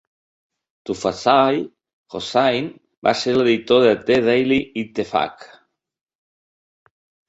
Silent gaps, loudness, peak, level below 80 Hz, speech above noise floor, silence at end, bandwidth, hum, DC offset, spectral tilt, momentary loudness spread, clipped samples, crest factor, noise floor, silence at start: 1.93-2.04 s, 2.97-3.02 s; -19 LUFS; -2 dBFS; -58 dBFS; over 72 dB; 1.85 s; 8 kHz; none; under 0.1%; -5 dB/octave; 15 LU; under 0.1%; 18 dB; under -90 dBFS; 0.9 s